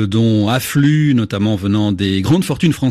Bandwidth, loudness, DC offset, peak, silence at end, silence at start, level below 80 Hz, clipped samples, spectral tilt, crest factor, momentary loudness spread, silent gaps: 14.5 kHz; -15 LUFS; under 0.1%; -2 dBFS; 0 s; 0 s; -46 dBFS; under 0.1%; -6.5 dB/octave; 12 dB; 3 LU; none